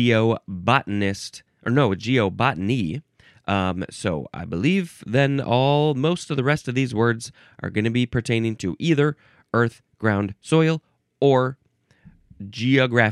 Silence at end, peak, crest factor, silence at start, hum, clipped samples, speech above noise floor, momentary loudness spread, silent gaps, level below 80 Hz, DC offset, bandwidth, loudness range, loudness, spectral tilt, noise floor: 0 s; 0 dBFS; 22 dB; 0 s; none; under 0.1%; 33 dB; 11 LU; none; -54 dBFS; under 0.1%; 12 kHz; 2 LU; -22 LUFS; -6.5 dB/octave; -54 dBFS